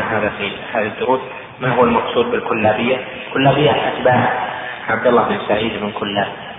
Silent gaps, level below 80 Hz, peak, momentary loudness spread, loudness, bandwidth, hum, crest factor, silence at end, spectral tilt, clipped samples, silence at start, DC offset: none; -48 dBFS; 0 dBFS; 8 LU; -17 LUFS; 3.9 kHz; none; 16 dB; 0 s; -9.5 dB/octave; under 0.1%; 0 s; under 0.1%